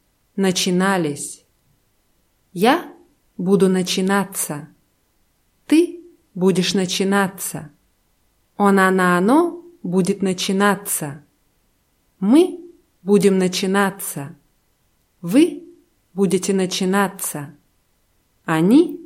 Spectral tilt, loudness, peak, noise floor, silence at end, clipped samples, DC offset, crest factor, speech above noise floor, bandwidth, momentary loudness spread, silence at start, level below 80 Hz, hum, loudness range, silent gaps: -5 dB/octave; -18 LUFS; -2 dBFS; -63 dBFS; 0 s; under 0.1%; under 0.1%; 18 dB; 46 dB; 16.5 kHz; 18 LU; 0.35 s; -64 dBFS; none; 3 LU; none